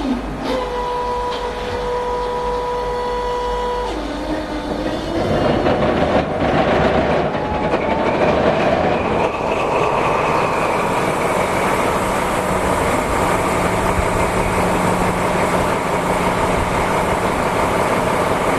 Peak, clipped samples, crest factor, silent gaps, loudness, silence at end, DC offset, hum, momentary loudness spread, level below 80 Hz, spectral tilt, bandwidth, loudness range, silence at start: -4 dBFS; under 0.1%; 14 dB; none; -18 LUFS; 0 s; 0.2%; none; 6 LU; -32 dBFS; -5.5 dB/octave; 14 kHz; 5 LU; 0 s